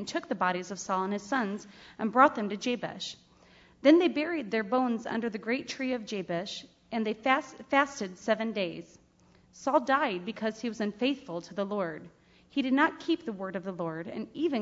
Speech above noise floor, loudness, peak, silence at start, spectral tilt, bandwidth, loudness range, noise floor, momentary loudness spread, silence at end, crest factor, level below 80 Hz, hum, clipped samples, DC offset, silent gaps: 32 dB; -30 LUFS; -8 dBFS; 0 s; -5 dB/octave; 7.8 kHz; 4 LU; -62 dBFS; 13 LU; 0 s; 22 dB; -70 dBFS; none; under 0.1%; under 0.1%; none